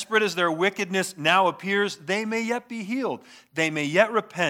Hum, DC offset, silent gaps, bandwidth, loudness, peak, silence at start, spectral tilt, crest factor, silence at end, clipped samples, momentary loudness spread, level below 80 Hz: none; under 0.1%; none; 17 kHz; -24 LUFS; -4 dBFS; 0 s; -4 dB/octave; 22 dB; 0 s; under 0.1%; 9 LU; -80 dBFS